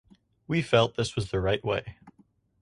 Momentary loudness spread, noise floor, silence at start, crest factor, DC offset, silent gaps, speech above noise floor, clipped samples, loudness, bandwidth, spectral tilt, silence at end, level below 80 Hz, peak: 8 LU; -64 dBFS; 0.5 s; 22 dB; under 0.1%; none; 37 dB; under 0.1%; -27 LUFS; 11 kHz; -5.5 dB/octave; 0.5 s; -50 dBFS; -8 dBFS